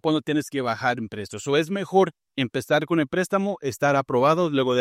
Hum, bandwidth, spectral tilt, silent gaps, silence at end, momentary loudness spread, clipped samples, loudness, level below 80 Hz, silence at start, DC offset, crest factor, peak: none; 15.5 kHz; -5.5 dB/octave; none; 0 s; 7 LU; under 0.1%; -23 LUFS; -66 dBFS; 0.05 s; under 0.1%; 18 dB; -6 dBFS